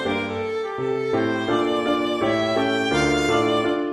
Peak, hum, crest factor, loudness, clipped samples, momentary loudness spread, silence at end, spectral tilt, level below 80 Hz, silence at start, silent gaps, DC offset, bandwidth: -8 dBFS; none; 14 dB; -22 LUFS; under 0.1%; 6 LU; 0 s; -5 dB/octave; -48 dBFS; 0 s; none; under 0.1%; 13 kHz